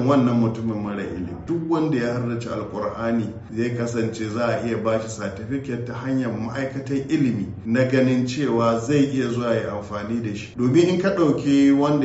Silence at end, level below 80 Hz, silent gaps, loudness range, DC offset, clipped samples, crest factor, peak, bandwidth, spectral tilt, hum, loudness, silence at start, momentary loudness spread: 0 s; -52 dBFS; none; 4 LU; under 0.1%; under 0.1%; 16 dB; -4 dBFS; 8 kHz; -6.5 dB/octave; none; -23 LUFS; 0 s; 10 LU